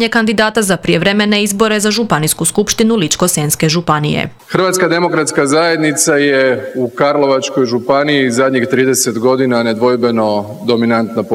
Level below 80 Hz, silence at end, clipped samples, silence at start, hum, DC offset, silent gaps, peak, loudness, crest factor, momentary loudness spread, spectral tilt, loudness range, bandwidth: -46 dBFS; 0 s; under 0.1%; 0 s; none; under 0.1%; none; 0 dBFS; -12 LUFS; 12 dB; 4 LU; -4 dB/octave; 1 LU; 16.5 kHz